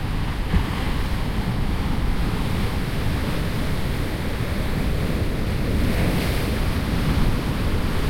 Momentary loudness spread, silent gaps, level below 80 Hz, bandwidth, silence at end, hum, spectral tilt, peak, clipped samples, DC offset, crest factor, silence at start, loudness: 4 LU; none; -26 dBFS; 16.5 kHz; 0 s; none; -6 dB/octave; -8 dBFS; under 0.1%; under 0.1%; 14 dB; 0 s; -24 LUFS